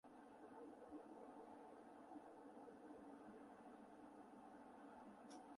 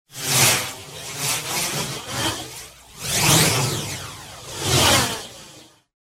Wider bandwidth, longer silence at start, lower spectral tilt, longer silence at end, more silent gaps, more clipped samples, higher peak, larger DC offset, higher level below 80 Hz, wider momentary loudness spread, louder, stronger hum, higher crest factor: second, 11 kHz vs 16.5 kHz; about the same, 0.05 s vs 0.1 s; first, -5.5 dB/octave vs -2 dB/octave; second, 0 s vs 0.45 s; neither; neither; second, -46 dBFS vs -2 dBFS; neither; second, -90 dBFS vs -46 dBFS; second, 3 LU vs 19 LU; second, -62 LUFS vs -19 LUFS; neither; second, 14 dB vs 20 dB